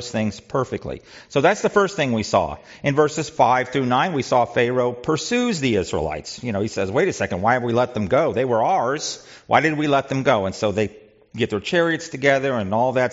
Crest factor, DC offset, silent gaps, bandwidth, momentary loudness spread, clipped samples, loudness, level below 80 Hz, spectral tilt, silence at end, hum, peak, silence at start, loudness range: 18 dB; under 0.1%; none; 8 kHz; 8 LU; under 0.1%; -21 LUFS; -52 dBFS; -4 dB/octave; 0 s; none; -2 dBFS; 0 s; 2 LU